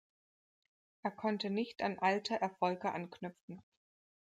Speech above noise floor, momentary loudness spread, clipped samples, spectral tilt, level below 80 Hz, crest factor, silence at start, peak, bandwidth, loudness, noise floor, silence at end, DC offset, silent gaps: over 53 dB; 15 LU; under 0.1%; -5.5 dB/octave; -84 dBFS; 20 dB; 1.05 s; -18 dBFS; 9.2 kHz; -37 LUFS; under -90 dBFS; 0.6 s; under 0.1%; 3.41-3.48 s